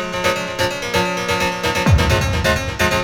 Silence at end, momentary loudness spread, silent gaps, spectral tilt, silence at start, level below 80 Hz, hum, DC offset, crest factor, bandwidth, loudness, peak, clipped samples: 0 s; 4 LU; none; -4.5 dB/octave; 0 s; -28 dBFS; none; under 0.1%; 16 dB; 18.5 kHz; -18 LUFS; -2 dBFS; under 0.1%